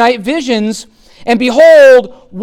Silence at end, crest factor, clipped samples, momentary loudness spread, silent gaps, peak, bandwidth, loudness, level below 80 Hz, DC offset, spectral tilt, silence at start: 0 s; 8 dB; under 0.1%; 20 LU; none; 0 dBFS; 14 kHz; -8 LUFS; -48 dBFS; under 0.1%; -4.5 dB/octave; 0 s